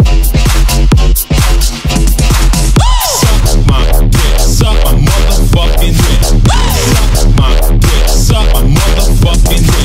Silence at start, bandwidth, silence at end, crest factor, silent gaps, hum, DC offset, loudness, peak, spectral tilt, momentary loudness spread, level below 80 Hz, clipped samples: 0 s; 16.5 kHz; 0 s; 6 dB; none; none; under 0.1%; -9 LUFS; 0 dBFS; -4.5 dB/octave; 1 LU; -8 dBFS; under 0.1%